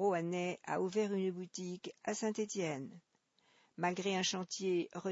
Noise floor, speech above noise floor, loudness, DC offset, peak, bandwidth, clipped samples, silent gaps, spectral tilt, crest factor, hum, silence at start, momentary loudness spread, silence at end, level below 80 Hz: -74 dBFS; 36 dB; -38 LUFS; under 0.1%; -22 dBFS; 7.6 kHz; under 0.1%; none; -4 dB/octave; 16 dB; none; 0 s; 9 LU; 0 s; -86 dBFS